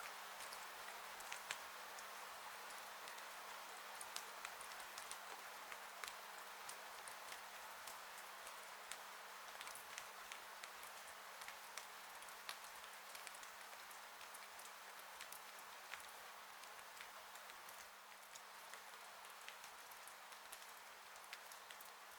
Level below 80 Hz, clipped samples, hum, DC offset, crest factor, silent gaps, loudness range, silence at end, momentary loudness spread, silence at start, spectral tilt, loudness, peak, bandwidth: -90 dBFS; under 0.1%; none; under 0.1%; 32 dB; none; 4 LU; 0 s; 5 LU; 0 s; 1 dB/octave; -53 LUFS; -22 dBFS; over 20 kHz